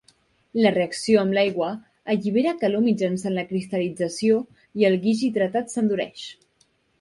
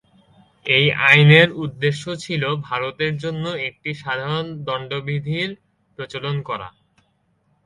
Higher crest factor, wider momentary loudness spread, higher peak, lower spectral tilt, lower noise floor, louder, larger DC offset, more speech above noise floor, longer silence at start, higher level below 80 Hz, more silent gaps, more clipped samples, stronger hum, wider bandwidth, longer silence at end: about the same, 18 dB vs 20 dB; second, 9 LU vs 17 LU; second, -4 dBFS vs 0 dBFS; about the same, -5.5 dB/octave vs -6 dB/octave; about the same, -65 dBFS vs -65 dBFS; second, -23 LUFS vs -19 LUFS; neither; about the same, 43 dB vs 45 dB; about the same, 0.55 s vs 0.65 s; second, -66 dBFS vs -58 dBFS; neither; neither; neither; about the same, 11.5 kHz vs 11 kHz; second, 0.7 s vs 0.95 s